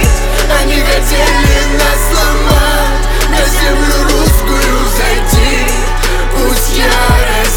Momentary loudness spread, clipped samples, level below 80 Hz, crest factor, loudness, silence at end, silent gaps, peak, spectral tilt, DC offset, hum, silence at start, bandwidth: 4 LU; under 0.1%; -10 dBFS; 8 dB; -11 LUFS; 0 s; none; 0 dBFS; -3.5 dB/octave; under 0.1%; none; 0 s; 19 kHz